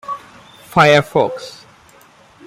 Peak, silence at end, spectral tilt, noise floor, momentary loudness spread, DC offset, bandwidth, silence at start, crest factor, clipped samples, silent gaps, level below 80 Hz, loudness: 0 dBFS; 0.95 s; -5 dB/octave; -47 dBFS; 20 LU; under 0.1%; 15.5 kHz; 0.1 s; 18 dB; under 0.1%; none; -52 dBFS; -14 LUFS